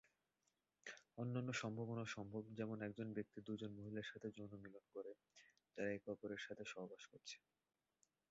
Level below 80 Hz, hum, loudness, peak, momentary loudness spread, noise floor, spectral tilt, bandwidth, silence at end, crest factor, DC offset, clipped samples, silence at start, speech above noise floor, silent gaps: -82 dBFS; none; -51 LUFS; -32 dBFS; 12 LU; -89 dBFS; -5 dB/octave; 7.6 kHz; 0.95 s; 20 dB; under 0.1%; under 0.1%; 0.85 s; 39 dB; none